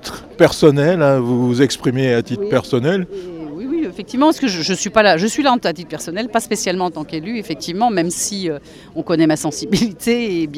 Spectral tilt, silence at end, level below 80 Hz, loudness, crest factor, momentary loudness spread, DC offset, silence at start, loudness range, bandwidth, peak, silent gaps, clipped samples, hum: -5 dB/octave; 0 s; -48 dBFS; -17 LUFS; 16 dB; 12 LU; under 0.1%; 0 s; 4 LU; 15.5 kHz; 0 dBFS; none; under 0.1%; none